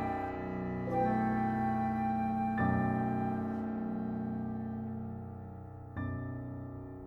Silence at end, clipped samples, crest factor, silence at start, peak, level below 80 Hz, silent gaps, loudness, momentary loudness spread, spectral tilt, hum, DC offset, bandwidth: 0 s; under 0.1%; 16 dB; 0 s; -18 dBFS; -56 dBFS; none; -35 LUFS; 13 LU; -10 dB/octave; none; under 0.1%; 5 kHz